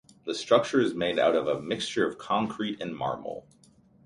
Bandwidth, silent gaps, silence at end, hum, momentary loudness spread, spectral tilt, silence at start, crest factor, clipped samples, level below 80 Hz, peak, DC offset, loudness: 11.5 kHz; none; 0.65 s; none; 11 LU; -4.5 dB/octave; 0.25 s; 20 dB; under 0.1%; -64 dBFS; -8 dBFS; under 0.1%; -28 LUFS